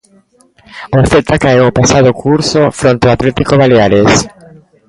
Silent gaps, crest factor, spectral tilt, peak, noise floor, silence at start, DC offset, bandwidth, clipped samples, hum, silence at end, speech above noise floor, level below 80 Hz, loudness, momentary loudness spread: none; 10 dB; -5.5 dB/octave; 0 dBFS; -39 dBFS; 0.75 s; under 0.1%; 11.5 kHz; under 0.1%; none; 0.6 s; 30 dB; -32 dBFS; -9 LUFS; 5 LU